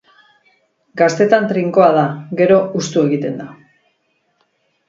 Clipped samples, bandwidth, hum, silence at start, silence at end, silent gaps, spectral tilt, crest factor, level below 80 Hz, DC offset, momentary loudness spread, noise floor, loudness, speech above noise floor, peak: under 0.1%; 7.8 kHz; none; 0.95 s; 1.35 s; none; -6 dB/octave; 16 dB; -60 dBFS; under 0.1%; 13 LU; -64 dBFS; -15 LUFS; 50 dB; 0 dBFS